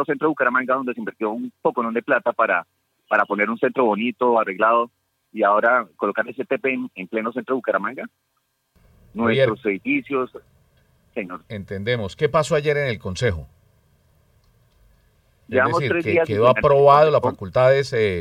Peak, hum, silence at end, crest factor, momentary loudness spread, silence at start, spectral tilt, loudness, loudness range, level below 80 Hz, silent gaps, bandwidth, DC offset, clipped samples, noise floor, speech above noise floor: -2 dBFS; none; 0 s; 18 dB; 13 LU; 0 s; -6.5 dB/octave; -20 LUFS; 7 LU; -54 dBFS; none; 12 kHz; under 0.1%; under 0.1%; -63 dBFS; 43 dB